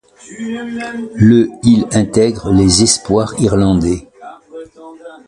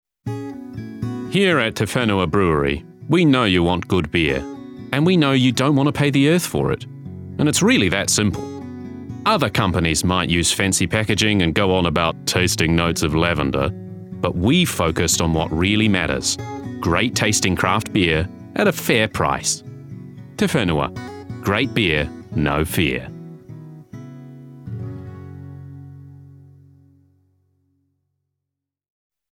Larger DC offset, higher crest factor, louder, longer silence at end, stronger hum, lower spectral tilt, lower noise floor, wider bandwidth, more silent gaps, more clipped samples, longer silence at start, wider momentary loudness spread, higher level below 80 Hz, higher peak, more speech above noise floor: neither; second, 14 dB vs 20 dB; first, -13 LUFS vs -19 LUFS; second, 0.1 s vs 3 s; neither; about the same, -5 dB/octave vs -4.5 dB/octave; second, -35 dBFS vs -83 dBFS; second, 11.5 kHz vs 17.5 kHz; neither; neither; about the same, 0.3 s vs 0.25 s; about the same, 17 LU vs 19 LU; first, -34 dBFS vs -40 dBFS; about the same, 0 dBFS vs -2 dBFS; second, 22 dB vs 65 dB